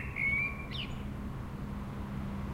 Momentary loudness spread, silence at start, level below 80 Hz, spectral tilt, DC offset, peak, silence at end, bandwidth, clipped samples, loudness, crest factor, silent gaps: 11 LU; 0 s; -44 dBFS; -6 dB/octave; under 0.1%; -22 dBFS; 0 s; 16 kHz; under 0.1%; -36 LUFS; 16 dB; none